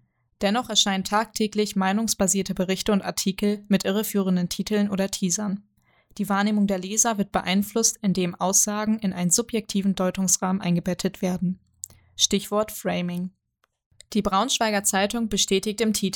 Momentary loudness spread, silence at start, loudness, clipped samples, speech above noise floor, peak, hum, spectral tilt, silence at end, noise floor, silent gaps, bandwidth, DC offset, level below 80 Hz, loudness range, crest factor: 7 LU; 0.4 s; -23 LUFS; under 0.1%; 33 dB; -4 dBFS; none; -3.5 dB/octave; 0 s; -57 dBFS; 13.86-13.91 s; 19.5 kHz; under 0.1%; -52 dBFS; 3 LU; 20 dB